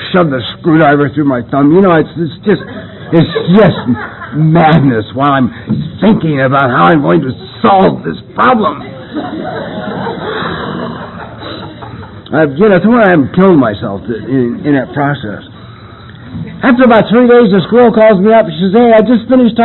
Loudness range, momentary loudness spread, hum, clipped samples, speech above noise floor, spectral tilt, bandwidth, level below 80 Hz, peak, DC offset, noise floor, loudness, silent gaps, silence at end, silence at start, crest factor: 7 LU; 17 LU; none; under 0.1%; 22 dB; -10.5 dB/octave; 4.2 kHz; -40 dBFS; 0 dBFS; under 0.1%; -31 dBFS; -9 LUFS; none; 0 s; 0 s; 10 dB